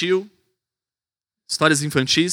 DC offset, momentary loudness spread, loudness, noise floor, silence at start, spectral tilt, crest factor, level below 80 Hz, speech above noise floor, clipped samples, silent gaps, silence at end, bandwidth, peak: under 0.1%; 7 LU; -19 LUFS; under -90 dBFS; 0 s; -3.5 dB/octave; 22 dB; -62 dBFS; over 71 dB; under 0.1%; none; 0 s; 18.5 kHz; 0 dBFS